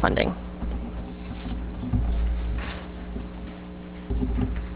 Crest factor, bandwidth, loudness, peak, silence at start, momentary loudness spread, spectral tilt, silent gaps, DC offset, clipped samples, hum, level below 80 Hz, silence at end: 24 dB; 4 kHz; -31 LUFS; -4 dBFS; 0 s; 12 LU; -10.5 dB/octave; none; under 0.1%; under 0.1%; none; -30 dBFS; 0 s